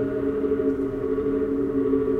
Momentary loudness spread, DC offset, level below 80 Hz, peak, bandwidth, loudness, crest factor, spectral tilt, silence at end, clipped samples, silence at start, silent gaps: 3 LU; under 0.1%; -44 dBFS; -10 dBFS; 4 kHz; -25 LUFS; 14 dB; -10 dB/octave; 0 s; under 0.1%; 0 s; none